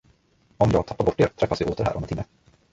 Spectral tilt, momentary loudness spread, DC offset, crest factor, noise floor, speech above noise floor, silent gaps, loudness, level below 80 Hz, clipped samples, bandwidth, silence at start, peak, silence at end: -7.5 dB/octave; 11 LU; under 0.1%; 20 dB; -61 dBFS; 38 dB; none; -24 LUFS; -42 dBFS; under 0.1%; 8 kHz; 0.6 s; -6 dBFS; 0.5 s